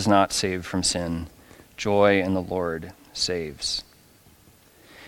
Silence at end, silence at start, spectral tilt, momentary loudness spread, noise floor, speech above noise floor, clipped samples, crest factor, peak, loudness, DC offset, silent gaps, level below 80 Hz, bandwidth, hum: 0 s; 0 s; -4 dB/octave; 15 LU; -55 dBFS; 31 dB; under 0.1%; 22 dB; -4 dBFS; -24 LUFS; under 0.1%; none; -52 dBFS; 17.5 kHz; none